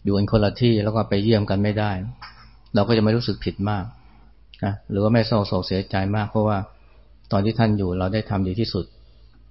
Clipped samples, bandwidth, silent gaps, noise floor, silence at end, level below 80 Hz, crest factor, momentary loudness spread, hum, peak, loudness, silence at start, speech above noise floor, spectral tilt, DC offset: under 0.1%; 5.8 kHz; none; -51 dBFS; 0.65 s; -44 dBFS; 18 dB; 10 LU; none; -4 dBFS; -22 LUFS; 0.05 s; 30 dB; -11 dB/octave; 0.3%